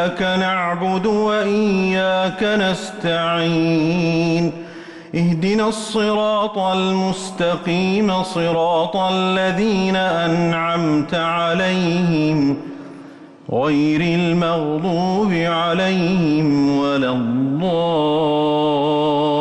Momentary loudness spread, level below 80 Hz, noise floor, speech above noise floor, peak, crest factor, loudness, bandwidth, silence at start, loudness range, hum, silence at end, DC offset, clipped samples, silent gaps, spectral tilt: 4 LU; -52 dBFS; -39 dBFS; 22 dB; -8 dBFS; 8 dB; -18 LUFS; 11.5 kHz; 0 s; 2 LU; none; 0 s; under 0.1%; under 0.1%; none; -6 dB/octave